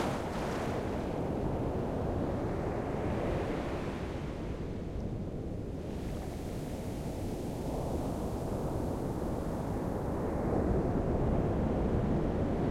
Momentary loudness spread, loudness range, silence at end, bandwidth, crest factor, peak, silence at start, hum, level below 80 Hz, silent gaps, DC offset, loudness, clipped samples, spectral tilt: 8 LU; 6 LU; 0 s; 16.5 kHz; 16 dB; -18 dBFS; 0 s; none; -42 dBFS; none; under 0.1%; -35 LUFS; under 0.1%; -7.5 dB/octave